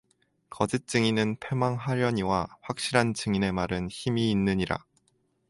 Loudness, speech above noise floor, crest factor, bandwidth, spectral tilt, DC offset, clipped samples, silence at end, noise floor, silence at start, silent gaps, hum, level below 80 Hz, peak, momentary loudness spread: -28 LUFS; 44 dB; 22 dB; 11.5 kHz; -5.5 dB/octave; under 0.1%; under 0.1%; 0.7 s; -71 dBFS; 0.5 s; none; none; -52 dBFS; -6 dBFS; 6 LU